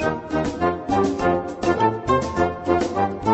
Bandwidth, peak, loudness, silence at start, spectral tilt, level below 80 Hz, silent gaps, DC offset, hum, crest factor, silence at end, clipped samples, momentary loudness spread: 8.4 kHz; -6 dBFS; -22 LUFS; 0 s; -6.5 dB/octave; -42 dBFS; none; under 0.1%; none; 16 dB; 0 s; under 0.1%; 4 LU